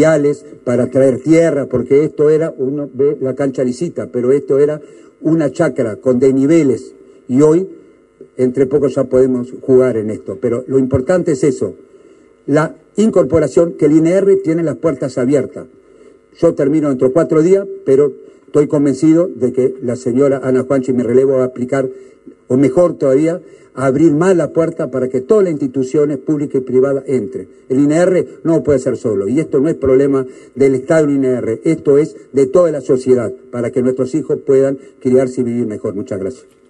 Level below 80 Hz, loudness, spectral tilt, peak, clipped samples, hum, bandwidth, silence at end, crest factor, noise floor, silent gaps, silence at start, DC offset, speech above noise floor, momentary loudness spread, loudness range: -48 dBFS; -14 LUFS; -7.5 dB/octave; 0 dBFS; under 0.1%; none; 10.5 kHz; 0.35 s; 12 dB; -45 dBFS; none; 0 s; under 0.1%; 32 dB; 8 LU; 2 LU